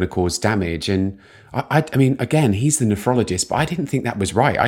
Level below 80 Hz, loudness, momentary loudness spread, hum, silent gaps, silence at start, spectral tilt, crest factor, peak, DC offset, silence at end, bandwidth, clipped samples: -44 dBFS; -19 LUFS; 5 LU; none; none; 0 s; -5 dB/octave; 18 dB; -2 dBFS; under 0.1%; 0 s; 17 kHz; under 0.1%